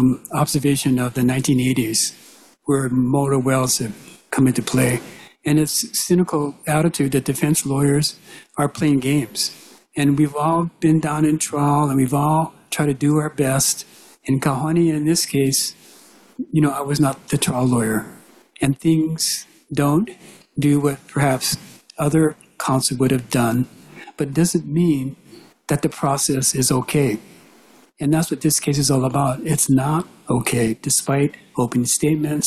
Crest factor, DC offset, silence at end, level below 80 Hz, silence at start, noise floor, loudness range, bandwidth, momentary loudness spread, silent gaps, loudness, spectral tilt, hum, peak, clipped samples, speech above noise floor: 14 dB; under 0.1%; 0 s; -50 dBFS; 0 s; -51 dBFS; 2 LU; 14.5 kHz; 8 LU; none; -19 LUFS; -5 dB/octave; none; -6 dBFS; under 0.1%; 32 dB